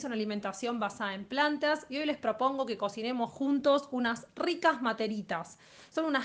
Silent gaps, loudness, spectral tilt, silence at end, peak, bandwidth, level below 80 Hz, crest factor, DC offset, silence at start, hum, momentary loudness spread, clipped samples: none; -32 LUFS; -4.5 dB/octave; 0 s; -12 dBFS; 9.6 kHz; -74 dBFS; 20 dB; under 0.1%; 0 s; none; 7 LU; under 0.1%